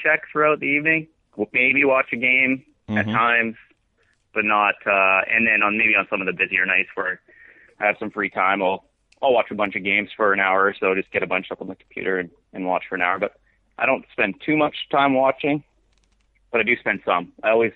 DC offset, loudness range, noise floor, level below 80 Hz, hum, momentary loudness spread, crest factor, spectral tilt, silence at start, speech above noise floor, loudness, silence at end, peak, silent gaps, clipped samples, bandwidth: under 0.1%; 5 LU; -65 dBFS; -62 dBFS; none; 11 LU; 18 dB; -7.5 dB/octave; 0 s; 44 dB; -20 LUFS; 0.05 s; -4 dBFS; none; under 0.1%; 4.5 kHz